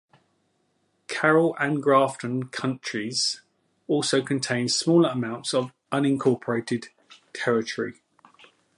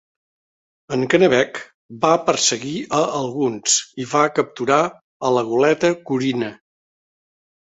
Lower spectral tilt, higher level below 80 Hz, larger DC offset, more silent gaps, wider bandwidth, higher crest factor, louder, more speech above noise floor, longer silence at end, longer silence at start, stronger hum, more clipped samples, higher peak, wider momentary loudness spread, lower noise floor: about the same, -4.5 dB/octave vs -3.5 dB/octave; second, -72 dBFS vs -62 dBFS; neither; second, none vs 1.74-1.89 s, 5.01-5.20 s; first, 11.5 kHz vs 8.4 kHz; about the same, 20 dB vs 18 dB; second, -24 LUFS vs -19 LUFS; second, 47 dB vs over 71 dB; second, 0.85 s vs 1.1 s; first, 1.1 s vs 0.9 s; neither; neither; second, -6 dBFS vs -2 dBFS; about the same, 11 LU vs 10 LU; second, -70 dBFS vs under -90 dBFS